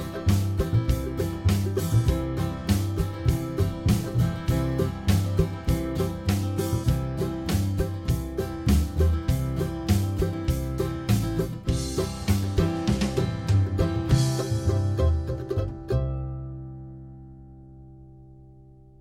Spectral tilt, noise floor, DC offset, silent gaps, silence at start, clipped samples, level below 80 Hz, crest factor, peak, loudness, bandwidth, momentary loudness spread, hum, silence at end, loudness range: -6.5 dB/octave; -50 dBFS; under 0.1%; none; 0 s; under 0.1%; -32 dBFS; 16 dB; -8 dBFS; -26 LUFS; 16.5 kHz; 6 LU; none; 0.35 s; 4 LU